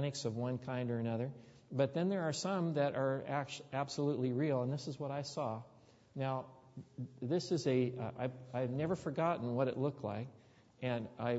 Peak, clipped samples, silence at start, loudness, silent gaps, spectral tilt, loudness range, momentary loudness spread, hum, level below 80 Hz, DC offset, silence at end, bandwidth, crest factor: -20 dBFS; under 0.1%; 0 s; -38 LUFS; none; -6.5 dB/octave; 3 LU; 10 LU; none; -74 dBFS; under 0.1%; 0 s; 7.6 kHz; 18 dB